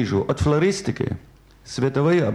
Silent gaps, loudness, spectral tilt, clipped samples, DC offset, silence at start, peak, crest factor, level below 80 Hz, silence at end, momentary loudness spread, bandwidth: none; -22 LUFS; -6.5 dB/octave; under 0.1%; under 0.1%; 0 s; -8 dBFS; 14 dB; -42 dBFS; 0 s; 11 LU; 11.5 kHz